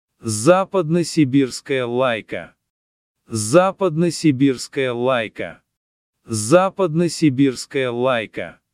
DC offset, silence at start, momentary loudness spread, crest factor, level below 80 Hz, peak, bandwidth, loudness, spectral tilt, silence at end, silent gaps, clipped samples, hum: under 0.1%; 0.25 s; 12 LU; 18 dB; -60 dBFS; 0 dBFS; 15 kHz; -19 LUFS; -5.5 dB/octave; 0.2 s; 2.70-3.15 s, 5.77-6.13 s; under 0.1%; none